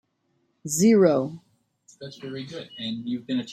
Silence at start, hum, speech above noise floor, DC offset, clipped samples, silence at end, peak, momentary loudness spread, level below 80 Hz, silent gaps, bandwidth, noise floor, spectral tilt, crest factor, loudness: 0.65 s; none; 47 dB; under 0.1%; under 0.1%; 0 s; -8 dBFS; 22 LU; -68 dBFS; none; 15.5 kHz; -71 dBFS; -5 dB/octave; 18 dB; -23 LUFS